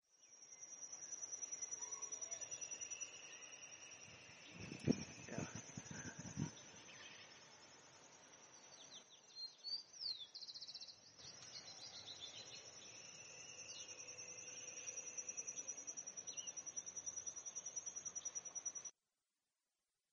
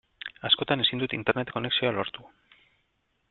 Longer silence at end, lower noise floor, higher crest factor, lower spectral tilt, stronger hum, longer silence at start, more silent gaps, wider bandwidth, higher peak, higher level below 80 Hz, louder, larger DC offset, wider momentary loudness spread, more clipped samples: first, 1.2 s vs 1.05 s; first, under -90 dBFS vs -74 dBFS; first, 30 dB vs 24 dB; second, -2 dB/octave vs -8 dB/octave; neither; second, 0.1 s vs 0.25 s; neither; first, 9 kHz vs 4.5 kHz; second, -22 dBFS vs -6 dBFS; second, -82 dBFS vs -64 dBFS; second, -49 LUFS vs -26 LUFS; neither; about the same, 12 LU vs 13 LU; neither